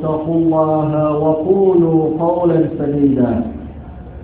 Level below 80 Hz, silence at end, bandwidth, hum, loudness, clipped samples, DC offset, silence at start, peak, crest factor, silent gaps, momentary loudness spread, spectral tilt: -38 dBFS; 0 s; 4 kHz; none; -15 LUFS; under 0.1%; under 0.1%; 0 s; 0 dBFS; 14 dB; none; 14 LU; -13.5 dB/octave